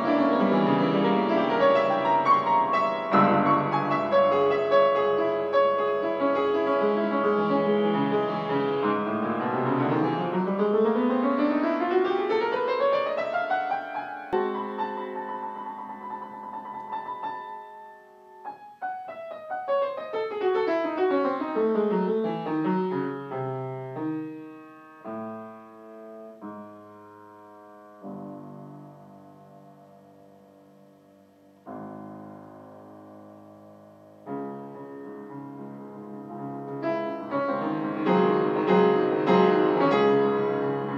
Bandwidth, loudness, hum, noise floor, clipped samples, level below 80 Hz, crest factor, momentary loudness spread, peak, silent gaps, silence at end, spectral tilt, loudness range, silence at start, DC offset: 7 kHz; -25 LUFS; none; -56 dBFS; under 0.1%; -76 dBFS; 18 dB; 20 LU; -8 dBFS; none; 0 s; -8 dB/octave; 22 LU; 0 s; under 0.1%